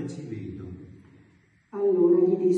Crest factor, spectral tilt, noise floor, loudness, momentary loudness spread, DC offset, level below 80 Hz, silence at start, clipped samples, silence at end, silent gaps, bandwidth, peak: 16 dB; -9.5 dB/octave; -60 dBFS; -23 LUFS; 21 LU; under 0.1%; -64 dBFS; 0 s; under 0.1%; 0 s; none; 7.6 kHz; -10 dBFS